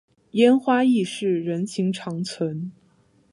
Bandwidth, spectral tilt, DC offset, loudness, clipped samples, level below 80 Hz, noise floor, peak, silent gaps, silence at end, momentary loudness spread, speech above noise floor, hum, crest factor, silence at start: 11.5 kHz; -6 dB/octave; under 0.1%; -22 LUFS; under 0.1%; -70 dBFS; -60 dBFS; -4 dBFS; none; 0.6 s; 12 LU; 38 dB; none; 18 dB; 0.35 s